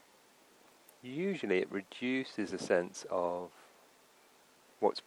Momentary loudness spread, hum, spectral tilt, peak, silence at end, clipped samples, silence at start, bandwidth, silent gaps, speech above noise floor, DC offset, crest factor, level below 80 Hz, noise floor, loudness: 10 LU; none; -5 dB/octave; -14 dBFS; 0.05 s; under 0.1%; 1.05 s; 16.5 kHz; none; 29 dB; under 0.1%; 24 dB; -82 dBFS; -64 dBFS; -36 LUFS